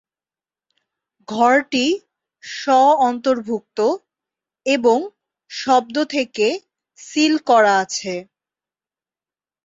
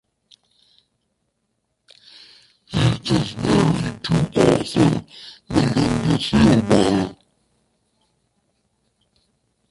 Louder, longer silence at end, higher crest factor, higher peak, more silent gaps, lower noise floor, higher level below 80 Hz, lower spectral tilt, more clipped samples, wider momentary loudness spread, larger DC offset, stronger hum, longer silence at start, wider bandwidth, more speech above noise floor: about the same, -18 LUFS vs -19 LUFS; second, 1.4 s vs 2.55 s; about the same, 16 dB vs 20 dB; about the same, -2 dBFS vs -2 dBFS; neither; first, under -90 dBFS vs -73 dBFS; second, -68 dBFS vs -42 dBFS; second, -3 dB/octave vs -6.5 dB/octave; neither; first, 15 LU vs 10 LU; neither; neither; second, 1.3 s vs 2.7 s; second, 7.8 kHz vs 11.5 kHz; first, over 73 dB vs 55 dB